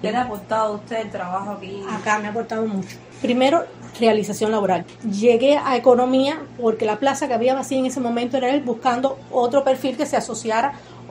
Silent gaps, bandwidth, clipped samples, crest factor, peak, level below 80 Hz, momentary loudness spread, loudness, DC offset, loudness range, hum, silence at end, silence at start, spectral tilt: none; 16 kHz; under 0.1%; 20 dB; -2 dBFS; -60 dBFS; 11 LU; -21 LUFS; under 0.1%; 5 LU; none; 0 s; 0 s; -4.5 dB/octave